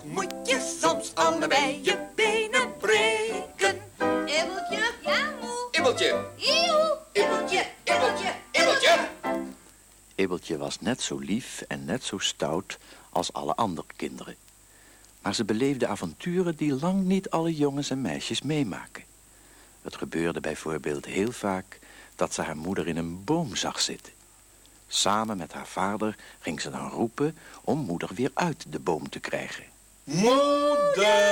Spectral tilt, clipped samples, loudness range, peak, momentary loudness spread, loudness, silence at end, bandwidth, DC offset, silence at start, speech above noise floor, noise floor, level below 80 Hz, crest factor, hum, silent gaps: -3.5 dB/octave; under 0.1%; 7 LU; -8 dBFS; 13 LU; -27 LUFS; 0 s; 19.5 kHz; under 0.1%; 0 s; 27 dB; -55 dBFS; -60 dBFS; 20 dB; none; none